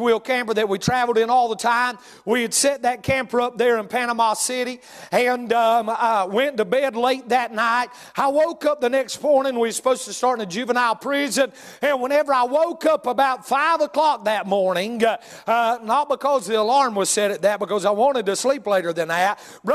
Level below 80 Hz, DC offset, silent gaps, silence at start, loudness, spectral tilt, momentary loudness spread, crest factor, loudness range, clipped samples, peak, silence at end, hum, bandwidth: -60 dBFS; under 0.1%; none; 0 s; -20 LUFS; -3 dB/octave; 4 LU; 16 dB; 1 LU; under 0.1%; -6 dBFS; 0 s; none; 14.5 kHz